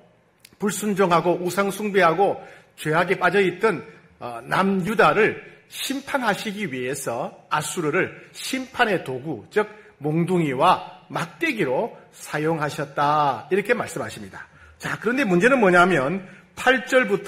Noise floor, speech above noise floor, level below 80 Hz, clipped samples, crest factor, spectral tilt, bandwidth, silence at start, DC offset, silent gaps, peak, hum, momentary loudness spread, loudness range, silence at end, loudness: -54 dBFS; 32 dB; -60 dBFS; under 0.1%; 20 dB; -5 dB/octave; 16 kHz; 0.6 s; under 0.1%; none; -2 dBFS; none; 14 LU; 4 LU; 0 s; -22 LUFS